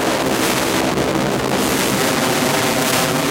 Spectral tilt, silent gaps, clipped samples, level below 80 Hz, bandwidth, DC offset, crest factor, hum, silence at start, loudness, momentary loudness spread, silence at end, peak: -3.5 dB/octave; none; under 0.1%; -42 dBFS; 17 kHz; under 0.1%; 14 dB; none; 0 s; -16 LUFS; 2 LU; 0 s; -4 dBFS